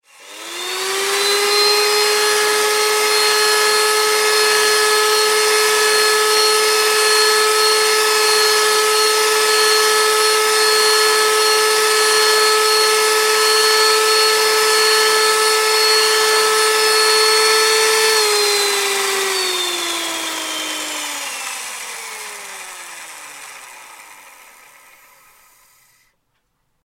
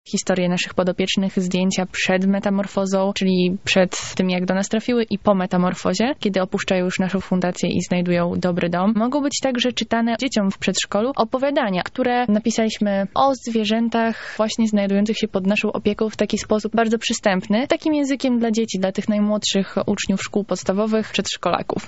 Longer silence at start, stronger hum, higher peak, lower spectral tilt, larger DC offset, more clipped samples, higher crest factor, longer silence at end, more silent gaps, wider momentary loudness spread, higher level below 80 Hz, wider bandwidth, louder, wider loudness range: first, 0.25 s vs 0.05 s; neither; about the same, 0 dBFS vs -2 dBFS; second, 2 dB/octave vs -4.5 dB/octave; second, under 0.1% vs 0.5%; neither; about the same, 16 dB vs 18 dB; first, 2.7 s vs 0 s; neither; first, 13 LU vs 3 LU; second, -68 dBFS vs -54 dBFS; first, 16.5 kHz vs 8 kHz; first, -13 LUFS vs -20 LUFS; first, 11 LU vs 1 LU